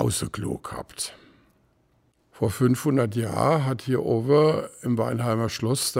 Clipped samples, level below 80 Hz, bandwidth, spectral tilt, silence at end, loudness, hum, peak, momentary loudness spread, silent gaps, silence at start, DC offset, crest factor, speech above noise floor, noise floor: under 0.1%; -54 dBFS; 16 kHz; -5.5 dB/octave; 0 s; -24 LUFS; none; -8 dBFS; 12 LU; none; 0 s; under 0.1%; 18 dB; 42 dB; -65 dBFS